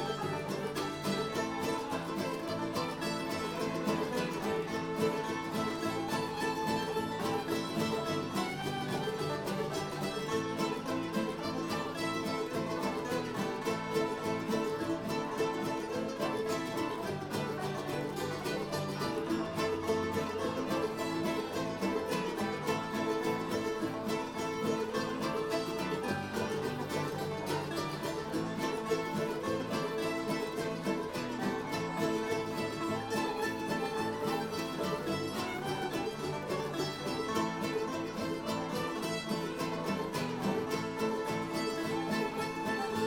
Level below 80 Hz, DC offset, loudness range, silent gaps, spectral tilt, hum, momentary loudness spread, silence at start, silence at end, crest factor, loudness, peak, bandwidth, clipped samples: -64 dBFS; under 0.1%; 1 LU; none; -5 dB/octave; none; 3 LU; 0 s; 0 s; 16 dB; -35 LUFS; -18 dBFS; 18 kHz; under 0.1%